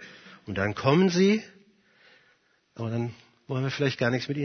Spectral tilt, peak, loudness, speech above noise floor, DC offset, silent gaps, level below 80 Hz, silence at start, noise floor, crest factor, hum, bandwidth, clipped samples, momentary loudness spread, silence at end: -6 dB/octave; -8 dBFS; -26 LUFS; 41 dB; under 0.1%; none; -66 dBFS; 0 s; -66 dBFS; 18 dB; none; 6.6 kHz; under 0.1%; 15 LU; 0 s